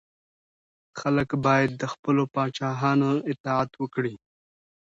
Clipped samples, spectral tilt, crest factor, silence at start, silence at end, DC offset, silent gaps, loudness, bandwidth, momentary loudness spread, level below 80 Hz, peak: under 0.1%; -7 dB/octave; 18 dB; 0.95 s; 0.7 s; under 0.1%; 1.99-2.03 s, 3.40-3.44 s; -25 LUFS; 7.8 kHz; 8 LU; -60 dBFS; -8 dBFS